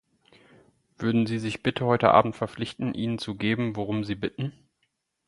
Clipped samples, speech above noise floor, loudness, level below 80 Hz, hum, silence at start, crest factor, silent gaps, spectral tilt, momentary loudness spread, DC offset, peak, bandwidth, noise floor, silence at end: under 0.1%; 50 dB; -26 LUFS; -58 dBFS; none; 1 s; 24 dB; none; -7 dB/octave; 12 LU; under 0.1%; -4 dBFS; 11.5 kHz; -76 dBFS; 0.75 s